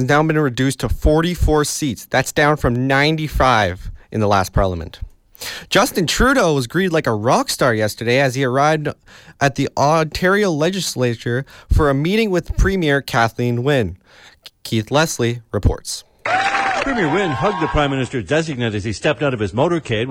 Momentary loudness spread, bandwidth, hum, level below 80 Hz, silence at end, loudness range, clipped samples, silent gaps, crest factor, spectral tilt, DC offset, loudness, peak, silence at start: 7 LU; 17 kHz; none; -30 dBFS; 0 s; 3 LU; under 0.1%; none; 14 dB; -5 dB/octave; under 0.1%; -18 LUFS; -4 dBFS; 0 s